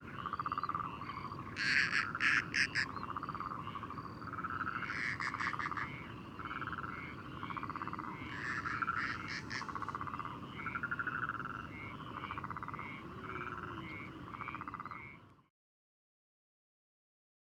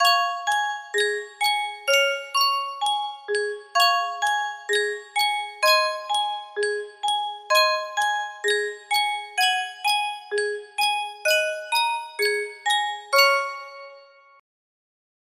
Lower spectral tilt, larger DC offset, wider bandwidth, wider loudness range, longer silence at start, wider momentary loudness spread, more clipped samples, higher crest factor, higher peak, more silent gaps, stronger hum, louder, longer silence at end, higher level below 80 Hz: first, -4 dB/octave vs 2 dB/octave; neither; first, 19 kHz vs 16 kHz; first, 11 LU vs 2 LU; about the same, 0 s vs 0 s; first, 14 LU vs 8 LU; neither; about the same, 24 dB vs 20 dB; second, -18 dBFS vs -4 dBFS; neither; neither; second, -39 LUFS vs -23 LUFS; first, 2.05 s vs 1.35 s; first, -64 dBFS vs -76 dBFS